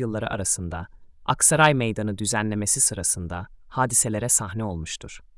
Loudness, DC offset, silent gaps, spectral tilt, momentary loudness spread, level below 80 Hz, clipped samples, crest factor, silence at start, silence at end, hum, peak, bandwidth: -22 LUFS; under 0.1%; none; -3 dB/octave; 16 LU; -48 dBFS; under 0.1%; 18 dB; 0 s; 0.2 s; none; -6 dBFS; 12 kHz